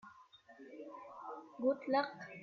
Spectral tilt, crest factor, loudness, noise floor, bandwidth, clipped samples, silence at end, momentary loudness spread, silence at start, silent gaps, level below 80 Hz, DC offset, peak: -6 dB/octave; 20 dB; -39 LUFS; -62 dBFS; 6.8 kHz; under 0.1%; 0 s; 21 LU; 0.05 s; none; -86 dBFS; under 0.1%; -22 dBFS